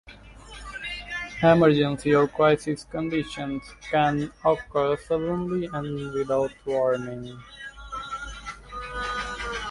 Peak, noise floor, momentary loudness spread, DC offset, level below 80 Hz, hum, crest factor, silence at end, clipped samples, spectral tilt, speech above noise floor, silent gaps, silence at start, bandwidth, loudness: -6 dBFS; -46 dBFS; 17 LU; under 0.1%; -48 dBFS; none; 20 dB; 0 s; under 0.1%; -6.5 dB/octave; 22 dB; none; 0.05 s; 11.5 kHz; -25 LUFS